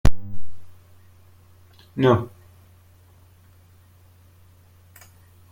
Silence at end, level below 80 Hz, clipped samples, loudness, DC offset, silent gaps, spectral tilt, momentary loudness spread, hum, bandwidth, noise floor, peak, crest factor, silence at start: 3.25 s; -36 dBFS; under 0.1%; -22 LUFS; under 0.1%; none; -7.5 dB/octave; 29 LU; none; 16.5 kHz; -52 dBFS; -2 dBFS; 20 dB; 0.05 s